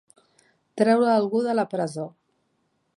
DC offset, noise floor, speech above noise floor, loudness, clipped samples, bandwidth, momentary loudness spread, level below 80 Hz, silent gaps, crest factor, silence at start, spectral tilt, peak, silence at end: under 0.1%; -71 dBFS; 50 dB; -23 LUFS; under 0.1%; 11.5 kHz; 17 LU; -78 dBFS; none; 18 dB; 0.75 s; -6.5 dB/octave; -8 dBFS; 0.85 s